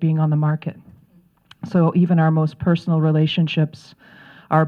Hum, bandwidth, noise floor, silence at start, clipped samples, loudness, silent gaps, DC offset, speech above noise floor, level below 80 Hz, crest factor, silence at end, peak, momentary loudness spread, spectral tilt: none; 5.6 kHz; -55 dBFS; 0 s; under 0.1%; -19 LUFS; none; under 0.1%; 37 dB; -56 dBFS; 16 dB; 0 s; -2 dBFS; 8 LU; -9 dB/octave